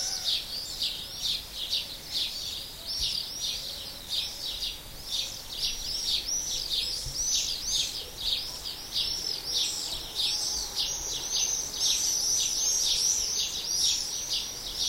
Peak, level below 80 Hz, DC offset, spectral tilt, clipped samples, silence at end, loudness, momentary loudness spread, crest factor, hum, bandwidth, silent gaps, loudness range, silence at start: -12 dBFS; -50 dBFS; under 0.1%; 1 dB/octave; under 0.1%; 0 s; -28 LUFS; 9 LU; 18 dB; none; 16 kHz; none; 6 LU; 0 s